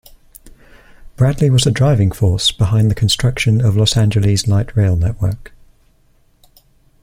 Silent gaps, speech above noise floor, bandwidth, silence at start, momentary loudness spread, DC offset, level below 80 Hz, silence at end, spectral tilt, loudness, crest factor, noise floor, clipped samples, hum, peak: none; 40 dB; 16 kHz; 0.45 s; 4 LU; under 0.1%; -34 dBFS; 1.6 s; -5.5 dB/octave; -14 LUFS; 14 dB; -53 dBFS; under 0.1%; none; -2 dBFS